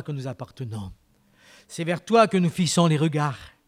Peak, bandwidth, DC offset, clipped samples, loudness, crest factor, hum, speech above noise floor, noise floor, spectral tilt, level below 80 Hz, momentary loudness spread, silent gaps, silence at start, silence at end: -6 dBFS; 15 kHz; under 0.1%; under 0.1%; -22 LUFS; 20 dB; none; 33 dB; -57 dBFS; -5.5 dB/octave; -58 dBFS; 17 LU; none; 0 s; 0.2 s